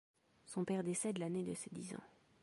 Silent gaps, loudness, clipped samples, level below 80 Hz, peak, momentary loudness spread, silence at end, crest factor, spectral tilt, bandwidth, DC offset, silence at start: none; -42 LUFS; under 0.1%; -80 dBFS; -28 dBFS; 10 LU; 0.35 s; 16 dB; -5.5 dB/octave; 11.5 kHz; under 0.1%; 0.45 s